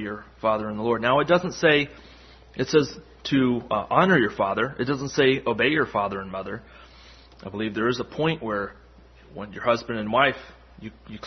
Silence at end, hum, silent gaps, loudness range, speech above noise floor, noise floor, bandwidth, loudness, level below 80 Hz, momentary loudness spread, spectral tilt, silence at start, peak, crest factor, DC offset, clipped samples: 0 s; none; none; 6 LU; 27 dB; -50 dBFS; 6.4 kHz; -23 LUFS; -52 dBFS; 18 LU; -5.5 dB/octave; 0 s; -4 dBFS; 20 dB; under 0.1%; under 0.1%